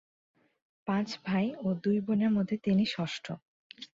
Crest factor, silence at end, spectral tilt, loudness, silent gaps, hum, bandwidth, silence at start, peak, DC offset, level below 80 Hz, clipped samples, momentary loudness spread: 14 dB; 0.1 s; -7 dB/octave; -31 LUFS; 3.42-3.70 s; none; 7.6 kHz; 0.85 s; -18 dBFS; under 0.1%; -68 dBFS; under 0.1%; 14 LU